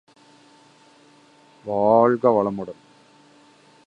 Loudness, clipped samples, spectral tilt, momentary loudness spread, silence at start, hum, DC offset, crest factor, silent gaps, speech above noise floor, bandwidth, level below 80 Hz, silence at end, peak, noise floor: -20 LUFS; under 0.1%; -8.5 dB/octave; 19 LU; 1.65 s; none; under 0.1%; 20 dB; none; 35 dB; 9.2 kHz; -66 dBFS; 1.15 s; -4 dBFS; -53 dBFS